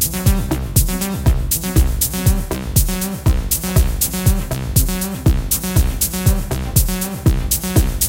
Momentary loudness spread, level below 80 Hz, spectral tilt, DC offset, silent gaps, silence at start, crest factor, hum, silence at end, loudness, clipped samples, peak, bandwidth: 3 LU; -20 dBFS; -4.5 dB/octave; under 0.1%; none; 0 s; 16 dB; none; 0 s; -18 LUFS; under 0.1%; 0 dBFS; 17.5 kHz